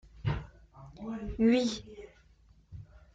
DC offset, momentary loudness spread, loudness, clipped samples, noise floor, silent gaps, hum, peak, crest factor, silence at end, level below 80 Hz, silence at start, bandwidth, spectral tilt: under 0.1%; 26 LU; -31 LUFS; under 0.1%; -62 dBFS; none; none; -14 dBFS; 20 dB; 0.15 s; -50 dBFS; 0.15 s; 7.8 kHz; -6.5 dB/octave